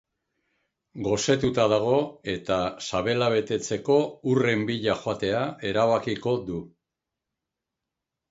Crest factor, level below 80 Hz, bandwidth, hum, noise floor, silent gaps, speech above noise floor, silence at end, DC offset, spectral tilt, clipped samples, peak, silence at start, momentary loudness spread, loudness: 20 dB; -56 dBFS; 8 kHz; none; -86 dBFS; none; 61 dB; 1.65 s; under 0.1%; -5 dB/octave; under 0.1%; -6 dBFS; 0.95 s; 6 LU; -25 LUFS